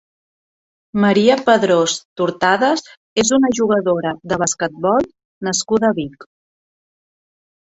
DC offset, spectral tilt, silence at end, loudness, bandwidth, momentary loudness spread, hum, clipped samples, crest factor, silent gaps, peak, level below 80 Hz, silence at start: under 0.1%; -4 dB/octave; 1.5 s; -17 LUFS; 8.2 kHz; 10 LU; none; under 0.1%; 16 dB; 2.05-2.16 s, 2.97-3.16 s, 5.25-5.41 s; -2 dBFS; -56 dBFS; 0.95 s